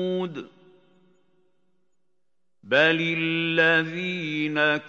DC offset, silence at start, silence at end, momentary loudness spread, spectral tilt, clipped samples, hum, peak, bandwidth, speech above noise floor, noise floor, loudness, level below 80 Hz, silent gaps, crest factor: under 0.1%; 0 s; 0 s; 10 LU; -6 dB/octave; under 0.1%; none; -6 dBFS; 7.8 kHz; 58 dB; -82 dBFS; -23 LUFS; -84 dBFS; none; 20 dB